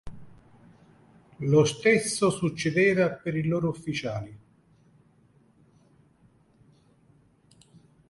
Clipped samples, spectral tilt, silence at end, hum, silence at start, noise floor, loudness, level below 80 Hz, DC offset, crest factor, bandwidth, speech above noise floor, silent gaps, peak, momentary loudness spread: under 0.1%; -5.5 dB/octave; 3.75 s; none; 0.05 s; -61 dBFS; -25 LUFS; -60 dBFS; under 0.1%; 22 dB; 11.5 kHz; 37 dB; none; -8 dBFS; 12 LU